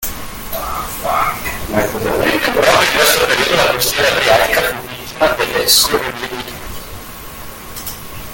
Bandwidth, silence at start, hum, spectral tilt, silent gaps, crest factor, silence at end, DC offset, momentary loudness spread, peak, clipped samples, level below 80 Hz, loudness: 17 kHz; 0 s; none; -2 dB/octave; none; 16 dB; 0 s; under 0.1%; 18 LU; 0 dBFS; under 0.1%; -36 dBFS; -13 LUFS